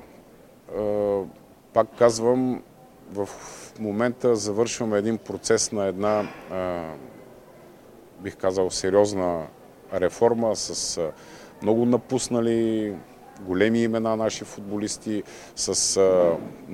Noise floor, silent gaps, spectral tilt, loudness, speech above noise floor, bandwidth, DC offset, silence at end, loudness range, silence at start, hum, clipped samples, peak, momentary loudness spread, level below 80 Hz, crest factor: -50 dBFS; none; -4 dB/octave; -24 LUFS; 26 dB; 16 kHz; under 0.1%; 0 s; 3 LU; 0 s; none; under 0.1%; -4 dBFS; 15 LU; -56 dBFS; 22 dB